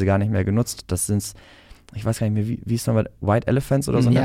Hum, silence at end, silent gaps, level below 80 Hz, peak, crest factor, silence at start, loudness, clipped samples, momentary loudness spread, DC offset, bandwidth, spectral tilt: none; 0 s; none; -44 dBFS; -8 dBFS; 14 dB; 0 s; -22 LUFS; under 0.1%; 6 LU; under 0.1%; 16 kHz; -6.5 dB/octave